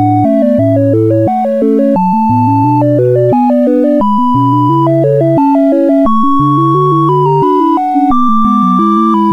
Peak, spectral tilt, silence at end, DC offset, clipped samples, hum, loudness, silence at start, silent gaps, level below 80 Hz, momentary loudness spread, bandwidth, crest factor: 0 dBFS; -10 dB/octave; 0 s; under 0.1%; under 0.1%; none; -9 LUFS; 0 s; none; -40 dBFS; 1 LU; 6.2 kHz; 8 dB